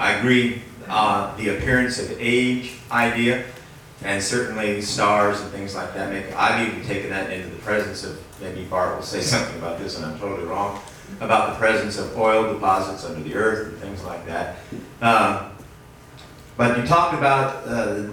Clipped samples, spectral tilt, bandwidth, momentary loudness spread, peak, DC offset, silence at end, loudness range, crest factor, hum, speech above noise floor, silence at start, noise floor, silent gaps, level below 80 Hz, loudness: under 0.1%; -4.5 dB/octave; 18.5 kHz; 14 LU; -4 dBFS; under 0.1%; 0 s; 4 LU; 20 dB; none; 22 dB; 0 s; -44 dBFS; none; -48 dBFS; -22 LUFS